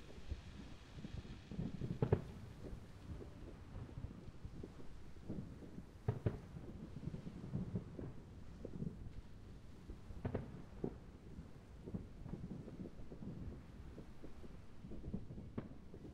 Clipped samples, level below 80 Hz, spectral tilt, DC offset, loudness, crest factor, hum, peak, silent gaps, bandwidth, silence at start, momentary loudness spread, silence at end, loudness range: under 0.1%; -58 dBFS; -8.5 dB/octave; under 0.1%; -50 LUFS; 28 dB; none; -20 dBFS; none; 12.5 kHz; 0 s; 12 LU; 0 s; 6 LU